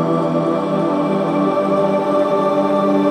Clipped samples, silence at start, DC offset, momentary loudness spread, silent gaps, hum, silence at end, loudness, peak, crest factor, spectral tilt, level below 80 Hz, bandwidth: under 0.1%; 0 s; under 0.1%; 2 LU; none; none; 0 s; -17 LUFS; -4 dBFS; 12 dB; -8 dB/octave; -60 dBFS; 11 kHz